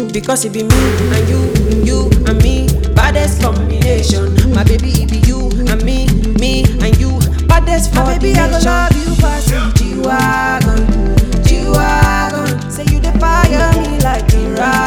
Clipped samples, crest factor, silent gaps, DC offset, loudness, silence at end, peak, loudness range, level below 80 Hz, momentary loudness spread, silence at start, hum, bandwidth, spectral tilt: 0.8%; 10 dB; none; under 0.1%; -12 LUFS; 0 s; 0 dBFS; 1 LU; -14 dBFS; 4 LU; 0 s; none; 18.5 kHz; -5.5 dB/octave